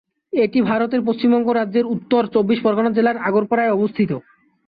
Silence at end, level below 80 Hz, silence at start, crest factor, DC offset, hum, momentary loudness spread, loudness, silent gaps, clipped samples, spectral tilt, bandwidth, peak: 0.5 s; -60 dBFS; 0.35 s; 14 dB; under 0.1%; none; 4 LU; -18 LUFS; none; under 0.1%; -10.5 dB/octave; 5 kHz; -6 dBFS